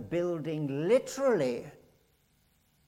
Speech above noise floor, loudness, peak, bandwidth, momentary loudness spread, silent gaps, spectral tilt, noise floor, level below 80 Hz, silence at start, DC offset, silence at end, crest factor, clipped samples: 40 dB; -30 LUFS; -14 dBFS; 15.5 kHz; 9 LU; none; -6 dB/octave; -69 dBFS; -68 dBFS; 0 s; under 0.1%; 1.15 s; 16 dB; under 0.1%